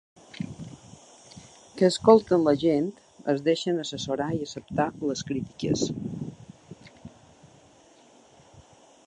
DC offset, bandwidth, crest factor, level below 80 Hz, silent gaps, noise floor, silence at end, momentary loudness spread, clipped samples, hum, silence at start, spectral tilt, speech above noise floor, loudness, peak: under 0.1%; 10.5 kHz; 24 dB; -60 dBFS; none; -56 dBFS; 0.45 s; 28 LU; under 0.1%; none; 0.35 s; -5.5 dB/octave; 32 dB; -26 LUFS; -4 dBFS